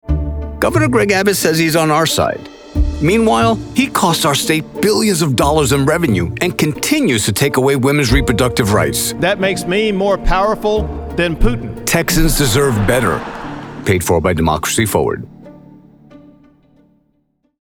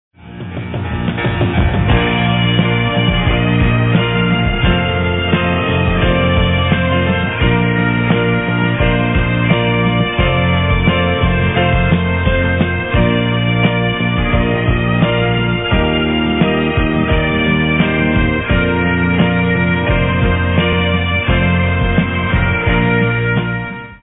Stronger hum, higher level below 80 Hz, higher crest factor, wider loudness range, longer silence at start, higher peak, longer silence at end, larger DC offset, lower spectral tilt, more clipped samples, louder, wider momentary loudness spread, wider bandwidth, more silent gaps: neither; about the same, -26 dBFS vs -24 dBFS; about the same, 14 dB vs 12 dB; first, 4 LU vs 1 LU; second, 0.05 s vs 0.2 s; about the same, 0 dBFS vs 0 dBFS; first, 1.45 s vs 0.05 s; neither; second, -4.5 dB/octave vs -10.5 dB/octave; neither; about the same, -14 LUFS vs -14 LUFS; first, 7 LU vs 2 LU; first, over 20 kHz vs 4 kHz; neither